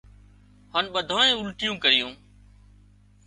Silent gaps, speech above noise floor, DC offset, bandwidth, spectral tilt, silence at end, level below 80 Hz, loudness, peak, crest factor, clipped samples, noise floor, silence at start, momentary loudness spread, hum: none; 31 dB; under 0.1%; 11.5 kHz; -2 dB/octave; 1.1 s; -56 dBFS; -22 LUFS; -4 dBFS; 22 dB; under 0.1%; -55 dBFS; 0.75 s; 9 LU; 50 Hz at -50 dBFS